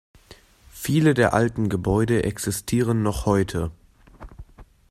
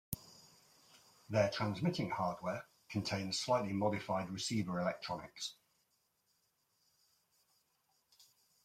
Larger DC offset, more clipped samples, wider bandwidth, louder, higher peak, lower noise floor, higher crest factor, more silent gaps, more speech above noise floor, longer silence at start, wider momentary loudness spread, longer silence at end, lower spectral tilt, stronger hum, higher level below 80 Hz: neither; neither; about the same, 15.5 kHz vs 16.5 kHz; first, -22 LUFS vs -38 LUFS; first, -4 dBFS vs -14 dBFS; second, -51 dBFS vs -80 dBFS; second, 20 dB vs 26 dB; neither; second, 29 dB vs 42 dB; first, 0.75 s vs 0.1 s; about the same, 9 LU vs 11 LU; second, 0.3 s vs 3.1 s; about the same, -6 dB/octave vs -5 dB/octave; neither; first, -42 dBFS vs -72 dBFS